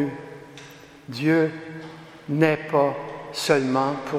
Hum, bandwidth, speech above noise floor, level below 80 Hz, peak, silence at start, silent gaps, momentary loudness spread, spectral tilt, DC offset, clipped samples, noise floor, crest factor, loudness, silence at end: none; 15 kHz; 23 dB; -66 dBFS; -4 dBFS; 0 s; none; 21 LU; -6 dB/octave; under 0.1%; under 0.1%; -45 dBFS; 22 dB; -23 LUFS; 0 s